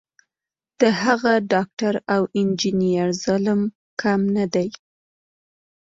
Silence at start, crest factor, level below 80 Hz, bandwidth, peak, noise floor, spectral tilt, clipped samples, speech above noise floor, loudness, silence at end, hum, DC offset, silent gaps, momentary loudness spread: 0.8 s; 18 dB; -60 dBFS; 7.8 kHz; -4 dBFS; -90 dBFS; -5.5 dB/octave; under 0.1%; 70 dB; -21 LUFS; 1.25 s; none; under 0.1%; 1.73-1.77 s, 3.75-3.97 s; 5 LU